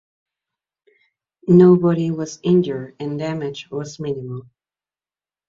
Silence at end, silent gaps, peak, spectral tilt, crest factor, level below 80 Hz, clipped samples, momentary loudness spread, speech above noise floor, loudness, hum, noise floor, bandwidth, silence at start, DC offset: 1.05 s; none; -2 dBFS; -8 dB/octave; 18 dB; -60 dBFS; under 0.1%; 17 LU; over 72 dB; -18 LUFS; none; under -90 dBFS; 7.4 kHz; 1.45 s; under 0.1%